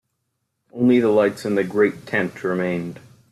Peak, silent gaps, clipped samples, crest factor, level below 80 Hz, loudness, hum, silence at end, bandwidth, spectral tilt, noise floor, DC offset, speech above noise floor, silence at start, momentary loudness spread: -6 dBFS; none; under 0.1%; 16 dB; -64 dBFS; -20 LUFS; none; 0.35 s; 13 kHz; -7 dB/octave; -75 dBFS; under 0.1%; 55 dB; 0.75 s; 11 LU